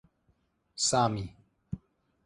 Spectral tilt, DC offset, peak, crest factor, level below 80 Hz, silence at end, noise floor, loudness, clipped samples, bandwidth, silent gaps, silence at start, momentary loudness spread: -3.5 dB/octave; under 0.1%; -12 dBFS; 22 dB; -58 dBFS; 0.5 s; -72 dBFS; -28 LUFS; under 0.1%; 11.5 kHz; none; 0.75 s; 18 LU